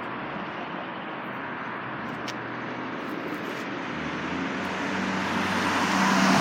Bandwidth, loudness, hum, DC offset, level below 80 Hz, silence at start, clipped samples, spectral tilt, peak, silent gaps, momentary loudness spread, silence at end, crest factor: 16.5 kHz; -29 LUFS; none; under 0.1%; -62 dBFS; 0 s; under 0.1%; -4.5 dB/octave; -8 dBFS; none; 11 LU; 0 s; 20 dB